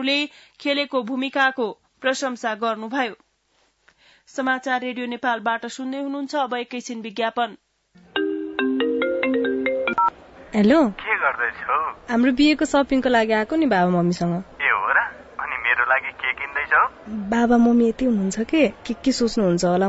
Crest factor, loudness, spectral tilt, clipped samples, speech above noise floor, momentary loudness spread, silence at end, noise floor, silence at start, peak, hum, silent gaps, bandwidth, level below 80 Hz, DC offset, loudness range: 16 dB; -21 LUFS; -5 dB/octave; under 0.1%; 44 dB; 11 LU; 0 s; -65 dBFS; 0 s; -6 dBFS; none; none; 8 kHz; -52 dBFS; under 0.1%; 7 LU